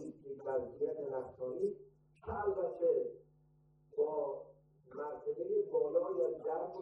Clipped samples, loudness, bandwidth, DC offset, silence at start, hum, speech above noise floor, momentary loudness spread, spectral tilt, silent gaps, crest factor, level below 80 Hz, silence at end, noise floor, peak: under 0.1%; -38 LUFS; 2.9 kHz; under 0.1%; 0 s; none; 32 dB; 14 LU; -9 dB/octave; none; 16 dB; -70 dBFS; 0 s; -69 dBFS; -22 dBFS